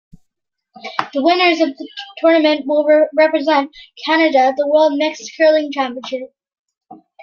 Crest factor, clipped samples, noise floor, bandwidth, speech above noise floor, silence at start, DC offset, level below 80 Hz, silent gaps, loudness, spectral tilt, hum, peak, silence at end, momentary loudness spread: 16 dB; under 0.1%; -73 dBFS; 7 kHz; 59 dB; 0.85 s; under 0.1%; -66 dBFS; 6.59-6.66 s, 6.77-6.81 s; -15 LUFS; -3 dB/octave; none; 0 dBFS; 0.3 s; 14 LU